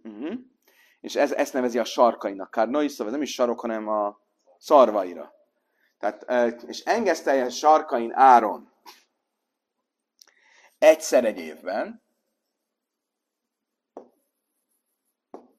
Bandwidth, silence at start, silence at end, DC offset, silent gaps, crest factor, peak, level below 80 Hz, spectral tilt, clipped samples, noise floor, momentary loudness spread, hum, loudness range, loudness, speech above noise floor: 14.5 kHz; 0.05 s; 1.55 s; under 0.1%; none; 22 dB; -2 dBFS; -80 dBFS; -3 dB/octave; under 0.1%; -83 dBFS; 17 LU; none; 4 LU; -22 LUFS; 62 dB